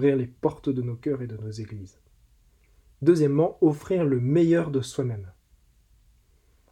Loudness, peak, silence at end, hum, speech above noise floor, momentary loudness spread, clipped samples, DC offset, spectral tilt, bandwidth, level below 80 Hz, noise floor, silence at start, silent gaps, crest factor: -25 LUFS; -8 dBFS; 1.4 s; none; 37 dB; 15 LU; under 0.1%; under 0.1%; -8 dB/octave; 12 kHz; -58 dBFS; -61 dBFS; 0 s; none; 18 dB